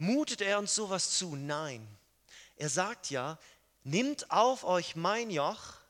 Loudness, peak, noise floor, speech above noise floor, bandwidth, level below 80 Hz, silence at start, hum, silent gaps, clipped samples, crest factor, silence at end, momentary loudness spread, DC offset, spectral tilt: -32 LUFS; -12 dBFS; -59 dBFS; 26 dB; 17 kHz; -74 dBFS; 0 s; none; none; under 0.1%; 20 dB; 0.1 s; 12 LU; under 0.1%; -3 dB/octave